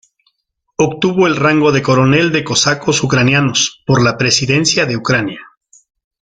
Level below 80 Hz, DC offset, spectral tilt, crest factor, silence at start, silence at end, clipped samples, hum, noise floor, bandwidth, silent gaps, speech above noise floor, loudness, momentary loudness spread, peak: -46 dBFS; under 0.1%; -4 dB/octave; 14 dB; 0.8 s; 0.75 s; under 0.1%; none; -68 dBFS; 9.4 kHz; none; 55 dB; -12 LUFS; 5 LU; 0 dBFS